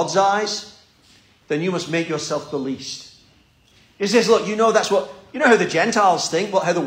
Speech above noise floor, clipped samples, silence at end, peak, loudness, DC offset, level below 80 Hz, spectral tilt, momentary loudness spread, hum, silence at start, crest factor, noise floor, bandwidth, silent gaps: 36 dB; under 0.1%; 0 s; -2 dBFS; -19 LUFS; under 0.1%; -64 dBFS; -3.5 dB/octave; 11 LU; none; 0 s; 18 dB; -55 dBFS; 16 kHz; none